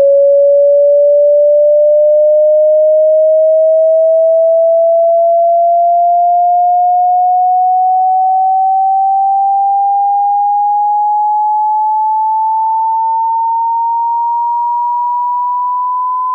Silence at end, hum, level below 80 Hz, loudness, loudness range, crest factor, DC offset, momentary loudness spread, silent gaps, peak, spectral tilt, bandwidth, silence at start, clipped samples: 0 s; none; under -90 dBFS; -10 LUFS; 5 LU; 6 dB; under 0.1%; 6 LU; none; -4 dBFS; 2.5 dB/octave; 1.1 kHz; 0 s; under 0.1%